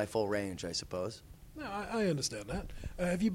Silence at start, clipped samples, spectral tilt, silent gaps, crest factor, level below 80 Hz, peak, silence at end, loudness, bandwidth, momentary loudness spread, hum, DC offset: 0 s; under 0.1%; -4.5 dB/octave; none; 18 dB; -52 dBFS; -18 dBFS; 0 s; -37 LUFS; 16 kHz; 13 LU; none; under 0.1%